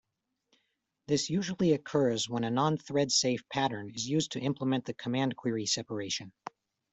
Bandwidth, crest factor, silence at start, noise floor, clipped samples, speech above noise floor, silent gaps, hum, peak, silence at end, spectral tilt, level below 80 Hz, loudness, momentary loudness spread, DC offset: 8.2 kHz; 18 dB; 1.1 s; -80 dBFS; under 0.1%; 49 dB; none; none; -14 dBFS; 0.65 s; -4.5 dB/octave; -68 dBFS; -31 LUFS; 8 LU; under 0.1%